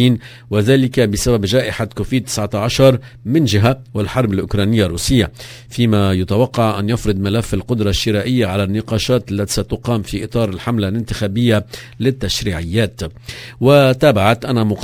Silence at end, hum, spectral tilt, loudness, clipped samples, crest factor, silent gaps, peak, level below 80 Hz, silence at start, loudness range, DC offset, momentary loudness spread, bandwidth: 0 s; none; -6 dB/octave; -16 LUFS; under 0.1%; 16 dB; none; 0 dBFS; -34 dBFS; 0 s; 3 LU; under 0.1%; 9 LU; 16 kHz